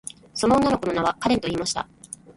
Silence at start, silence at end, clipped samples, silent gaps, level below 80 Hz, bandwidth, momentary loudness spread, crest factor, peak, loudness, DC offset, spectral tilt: 0.35 s; 0.05 s; under 0.1%; none; -48 dBFS; 11.5 kHz; 14 LU; 18 dB; -6 dBFS; -23 LUFS; under 0.1%; -4.5 dB/octave